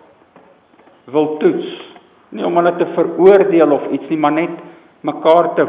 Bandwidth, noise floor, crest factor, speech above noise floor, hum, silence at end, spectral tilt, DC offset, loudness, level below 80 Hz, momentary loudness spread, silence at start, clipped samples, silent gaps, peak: 4 kHz; -48 dBFS; 16 dB; 35 dB; none; 0 s; -10.5 dB/octave; under 0.1%; -14 LUFS; -66 dBFS; 16 LU; 1.05 s; under 0.1%; none; 0 dBFS